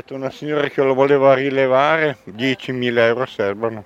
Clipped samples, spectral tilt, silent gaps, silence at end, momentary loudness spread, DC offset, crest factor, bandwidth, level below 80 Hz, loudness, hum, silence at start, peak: under 0.1%; -6.5 dB/octave; none; 0 s; 9 LU; under 0.1%; 16 dB; 8 kHz; -62 dBFS; -17 LUFS; none; 0.1 s; 0 dBFS